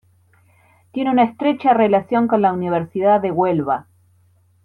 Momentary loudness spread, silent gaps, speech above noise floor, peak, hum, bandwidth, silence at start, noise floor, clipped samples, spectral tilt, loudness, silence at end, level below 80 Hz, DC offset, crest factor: 8 LU; none; 40 dB; -4 dBFS; none; 4.5 kHz; 0.95 s; -56 dBFS; under 0.1%; -9 dB/octave; -18 LUFS; 0.85 s; -62 dBFS; under 0.1%; 16 dB